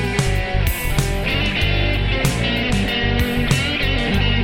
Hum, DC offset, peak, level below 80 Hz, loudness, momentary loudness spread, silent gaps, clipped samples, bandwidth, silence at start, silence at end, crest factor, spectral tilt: none; under 0.1%; -4 dBFS; -24 dBFS; -19 LUFS; 2 LU; none; under 0.1%; 18 kHz; 0 s; 0 s; 14 dB; -4.5 dB/octave